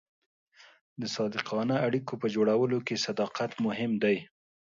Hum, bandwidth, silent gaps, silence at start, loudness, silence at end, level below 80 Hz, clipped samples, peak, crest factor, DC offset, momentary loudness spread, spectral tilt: none; 7.6 kHz; none; 1 s; -30 LUFS; 0.4 s; -74 dBFS; under 0.1%; -10 dBFS; 20 dB; under 0.1%; 6 LU; -5.5 dB/octave